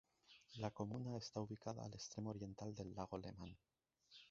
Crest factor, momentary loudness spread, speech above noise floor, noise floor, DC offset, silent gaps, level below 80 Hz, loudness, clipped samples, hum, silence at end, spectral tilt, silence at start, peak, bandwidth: 22 dB; 17 LU; 20 dB; -70 dBFS; under 0.1%; none; -72 dBFS; -50 LUFS; under 0.1%; none; 0 s; -6.5 dB/octave; 0.3 s; -28 dBFS; 7.6 kHz